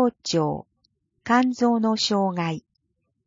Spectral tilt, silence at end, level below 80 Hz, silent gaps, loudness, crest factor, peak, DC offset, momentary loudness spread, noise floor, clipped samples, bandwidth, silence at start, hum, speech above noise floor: -5 dB/octave; 0.65 s; -62 dBFS; none; -23 LUFS; 18 dB; -8 dBFS; under 0.1%; 13 LU; -75 dBFS; under 0.1%; 7.6 kHz; 0 s; none; 53 dB